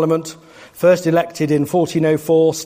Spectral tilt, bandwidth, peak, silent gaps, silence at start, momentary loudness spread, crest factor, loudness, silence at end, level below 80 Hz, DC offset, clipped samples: -6 dB/octave; 15.5 kHz; -2 dBFS; none; 0 s; 4 LU; 14 dB; -16 LUFS; 0 s; -58 dBFS; under 0.1%; under 0.1%